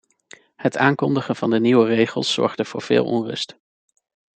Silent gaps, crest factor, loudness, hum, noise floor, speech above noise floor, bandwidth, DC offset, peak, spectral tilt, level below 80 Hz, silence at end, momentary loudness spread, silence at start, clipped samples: none; 18 dB; -20 LUFS; none; -50 dBFS; 30 dB; 9.2 kHz; under 0.1%; -2 dBFS; -5.5 dB/octave; -66 dBFS; 0.95 s; 11 LU; 0.6 s; under 0.1%